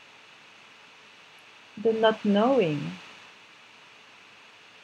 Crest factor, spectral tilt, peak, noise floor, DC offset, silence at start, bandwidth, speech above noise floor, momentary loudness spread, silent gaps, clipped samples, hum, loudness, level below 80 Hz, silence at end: 22 dB; -6.5 dB/octave; -8 dBFS; -52 dBFS; under 0.1%; 1.75 s; 9.2 kHz; 29 dB; 27 LU; none; under 0.1%; none; -25 LUFS; -80 dBFS; 1.7 s